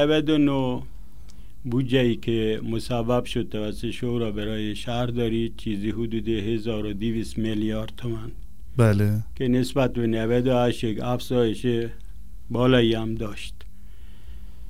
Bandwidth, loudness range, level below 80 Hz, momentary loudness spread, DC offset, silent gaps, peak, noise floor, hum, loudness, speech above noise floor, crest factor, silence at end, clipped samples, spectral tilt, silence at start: 15.5 kHz; 4 LU; -42 dBFS; 12 LU; 2%; none; -6 dBFS; -45 dBFS; none; -25 LUFS; 21 dB; 20 dB; 0 s; under 0.1%; -7 dB/octave; 0 s